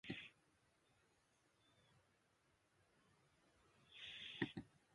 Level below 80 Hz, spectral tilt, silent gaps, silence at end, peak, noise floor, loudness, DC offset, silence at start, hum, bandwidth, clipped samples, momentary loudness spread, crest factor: -82 dBFS; -5 dB/octave; none; 0.2 s; -28 dBFS; -81 dBFS; -51 LUFS; under 0.1%; 0.05 s; none; 11 kHz; under 0.1%; 13 LU; 30 dB